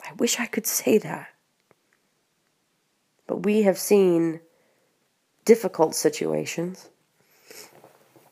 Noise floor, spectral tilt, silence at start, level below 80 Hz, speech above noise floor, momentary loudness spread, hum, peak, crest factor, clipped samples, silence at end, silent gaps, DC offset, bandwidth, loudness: -71 dBFS; -4 dB/octave; 0 s; -78 dBFS; 49 dB; 19 LU; none; -4 dBFS; 22 dB; under 0.1%; 0.65 s; none; under 0.1%; 15.5 kHz; -23 LUFS